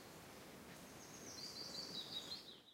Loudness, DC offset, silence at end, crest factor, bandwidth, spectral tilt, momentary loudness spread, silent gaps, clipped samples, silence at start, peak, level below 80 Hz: -50 LUFS; under 0.1%; 0 s; 16 dB; 16 kHz; -2 dB/octave; 10 LU; none; under 0.1%; 0 s; -36 dBFS; -78 dBFS